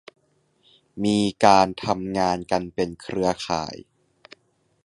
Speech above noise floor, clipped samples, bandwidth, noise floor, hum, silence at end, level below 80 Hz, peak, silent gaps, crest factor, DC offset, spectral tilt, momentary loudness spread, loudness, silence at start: 43 dB; under 0.1%; 11.5 kHz; -65 dBFS; none; 1.05 s; -54 dBFS; -2 dBFS; none; 22 dB; under 0.1%; -5 dB/octave; 12 LU; -22 LUFS; 0.95 s